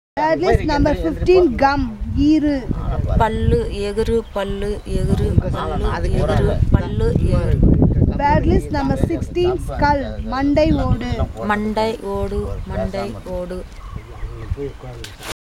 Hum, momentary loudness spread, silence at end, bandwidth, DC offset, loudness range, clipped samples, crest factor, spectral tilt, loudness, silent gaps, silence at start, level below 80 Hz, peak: none; 12 LU; 0.15 s; 13.5 kHz; under 0.1%; 7 LU; under 0.1%; 18 dB; -7.5 dB/octave; -19 LUFS; none; 0.15 s; -24 dBFS; 0 dBFS